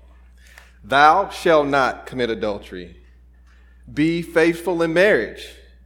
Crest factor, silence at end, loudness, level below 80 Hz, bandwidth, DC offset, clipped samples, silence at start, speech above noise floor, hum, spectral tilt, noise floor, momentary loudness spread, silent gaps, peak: 20 dB; 0.35 s; -18 LUFS; -46 dBFS; 17.5 kHz; under 0.1%; under 0.1%; 0.85 s; 30 dB; 60 Hz at -45 dBFS; -5.5 dB/octave; -49 dBFS; 17 LU; none; 0 dBFS